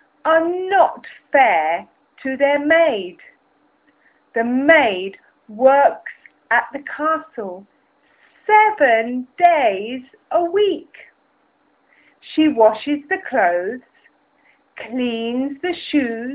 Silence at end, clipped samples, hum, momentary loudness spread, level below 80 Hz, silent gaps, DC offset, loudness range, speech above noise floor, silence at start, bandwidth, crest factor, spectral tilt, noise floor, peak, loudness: 0 s; under 0.1%; none; 17 LU; -64 dBFS; none; under 0.1%; 3 LU; 44 dB; 0.25 s; 4 kHz; 18 dB; -7.5 dB/octave; -61 dBFS; -2 dBFS; -17 LUFS